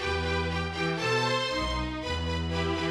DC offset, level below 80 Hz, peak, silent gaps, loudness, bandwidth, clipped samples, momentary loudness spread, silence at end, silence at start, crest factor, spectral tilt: under 0.1%; -40 dBFS; -14 dBFS; none; -29 LUFS; 12 kHz; under 0.1%; 5 LU; 0 s; 0 s; 14 dB; -5 dB/octave